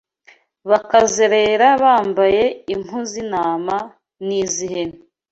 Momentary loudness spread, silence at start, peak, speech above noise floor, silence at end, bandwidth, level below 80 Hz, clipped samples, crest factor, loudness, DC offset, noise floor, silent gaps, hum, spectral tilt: 13 LU; 0.65 s; -2 dBFS; 36 dB; 0.35 s; 8.2 kHz; -54 dBFS; under 0.1%; 16 dB; -17 LUFS; under 0.1%; -52 dBFS; none; none; -3 dB/octave